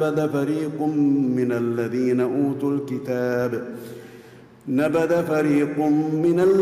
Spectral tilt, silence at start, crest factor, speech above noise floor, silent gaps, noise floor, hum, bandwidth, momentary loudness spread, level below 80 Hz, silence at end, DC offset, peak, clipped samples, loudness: -8 dB/octave; 0 s; 10 dB; 25 dB; none; -46 dBFS; none; 15 kHz; 7 LU; -64 dBFS; 0 s; under 0.1%; -12 dBFS; under 0.1%; -22 LUFS